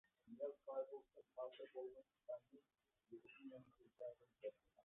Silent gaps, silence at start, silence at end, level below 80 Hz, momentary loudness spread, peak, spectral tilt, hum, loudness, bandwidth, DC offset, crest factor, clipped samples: none; 0.25 s; 0.05 s; under -90 dBFS; 13 LU; -36 dBFS; -2.5 dB/octave; none; -56 LUFS; 3.8 kHz; under 0.1%; 20 dB; under 0.1%